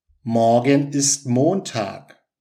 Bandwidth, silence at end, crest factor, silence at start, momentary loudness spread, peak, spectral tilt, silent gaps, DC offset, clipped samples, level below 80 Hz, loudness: 15 kHz; 0.4 s; 16 dB; 0.25 s; 10 LU; -2 dBFS; -4.5 dB/octave; none; under 0.1%; under 0.1%; -70 dBFS; -19 LUFS